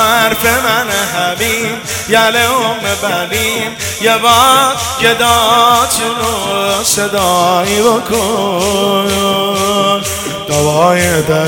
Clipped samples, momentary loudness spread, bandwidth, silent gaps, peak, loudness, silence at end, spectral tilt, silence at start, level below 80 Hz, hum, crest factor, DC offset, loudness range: 0.4%; 7 LU; over 20 kHz; none; 0 dBFS; -11 LUFS; 0 s; -2.5 dB/octave; 0 s; -42 dBFS; none; 12 dB; under 0.1%; 3 LU